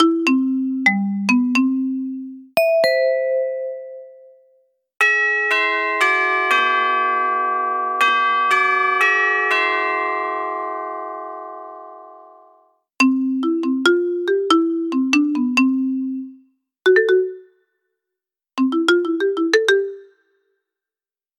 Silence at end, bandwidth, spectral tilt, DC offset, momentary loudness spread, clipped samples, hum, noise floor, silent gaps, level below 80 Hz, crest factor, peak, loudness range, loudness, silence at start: 1.35 s; 16 kHz; -4 dB/octave; under 0.1%; 14 LU; under 0.1%; none; under -90 dBFS; none; -82 dBFS; 16 dB; -4 dBFS; 5 LU; -18 LUFS; 0 s